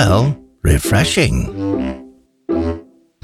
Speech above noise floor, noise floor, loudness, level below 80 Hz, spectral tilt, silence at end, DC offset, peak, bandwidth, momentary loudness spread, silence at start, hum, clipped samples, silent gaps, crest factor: 21 dB; -36 dBFS; -17 LUFS; -26 dBFS; -5.5 dB/octave; 0.4 s; under 0.1%; 0 dBFS; 16 kHz; 14 LU; 0 s; none; under 0.1%; none; 16 dB